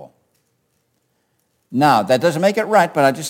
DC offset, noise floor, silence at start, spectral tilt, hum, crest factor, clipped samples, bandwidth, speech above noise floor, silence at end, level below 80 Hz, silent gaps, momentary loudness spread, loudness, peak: under 0.1%; -67 dBFS; 0 s; -5 dB/octave; none; 18 dB; under 0.1%; 17 kHz; 52 dB; 0 s; -68 dBFS; none; 4 LU; -16 LUFS; -2 dBFS